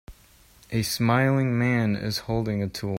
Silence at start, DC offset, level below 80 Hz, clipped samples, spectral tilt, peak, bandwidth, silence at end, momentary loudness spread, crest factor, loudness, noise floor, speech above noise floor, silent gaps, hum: 0.1 s; under 0.1%; -50 dBFS; under 0.1%; -6 dB/octave; -8 dBFS; 16.5 kHz; 0 s; 7 LU; 16 dB; -25 LUFS; -55 dBFS; 31 dB; none; none